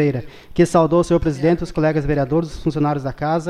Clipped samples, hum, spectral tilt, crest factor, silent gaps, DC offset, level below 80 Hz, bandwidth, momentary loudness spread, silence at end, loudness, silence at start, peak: under 0.1%; none; -7.5 dB/octave; 14 dB; none; under 0.1%; -36 dBFS; 12 kHz; 7 LU; 0 s; -19 LUFS; 0 s; -4 dBFS